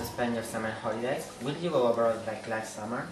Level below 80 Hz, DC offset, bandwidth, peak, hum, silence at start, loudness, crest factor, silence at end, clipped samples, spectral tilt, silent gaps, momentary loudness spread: -62 dBFS; under 0.1%; 13 kHz; -14 dBFS; none; 0 s; -31 LUFS; 18 dB; 0 s; under 0.1%; -5 dB/octave; none; 9 LU